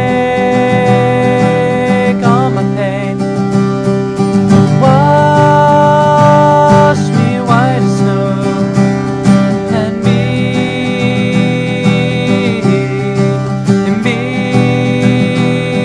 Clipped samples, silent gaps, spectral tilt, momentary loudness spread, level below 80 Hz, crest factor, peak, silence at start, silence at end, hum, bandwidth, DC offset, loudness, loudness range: 0.7%; none; -7 dB/octave; 6 LU; -40 dBFS; 10 dB; 0 dBFS; 0 s; 0 s; none; 10.5 kHz; under 0.1%; -10 LUFS; 4 LU